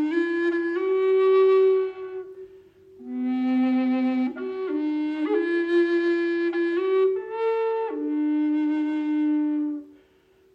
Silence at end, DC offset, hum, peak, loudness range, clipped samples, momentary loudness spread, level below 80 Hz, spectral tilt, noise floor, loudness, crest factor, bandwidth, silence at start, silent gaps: 0.65 s; under 0.1%; none; -12 dBFS; 3 LU; under 0.1%; 11 LU; -72 dBFS; -6 dB/octave; -59 dBFS; -24 LUFS; 10 dB; 5.6 kHz; 0 s; none